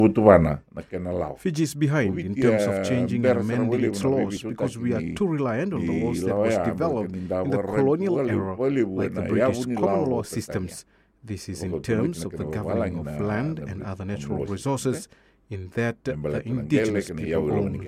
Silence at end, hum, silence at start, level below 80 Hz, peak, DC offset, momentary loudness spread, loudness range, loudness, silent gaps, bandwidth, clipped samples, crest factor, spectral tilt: 0 s; none; 0 s; -48 dBFS; 0 dBFS; under 0.1%; 10 LU; 6 LU; -25 LUFS; none; 15.5 kHz; under 0.1%; 24 dB; -7 dB/octave